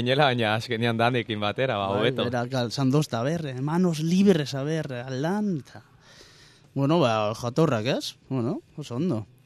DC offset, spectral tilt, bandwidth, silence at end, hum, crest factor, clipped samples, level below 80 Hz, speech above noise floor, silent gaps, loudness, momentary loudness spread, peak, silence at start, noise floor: under 0.1%; -6 dB/octave; 13.5 kHz; 0.2 s; none; 20 dB; under 0.1%; -64 dBFS; 29 dB; none; -25 LUFS; 8 LU; -6 dBFS; 0 s; -53 dBFS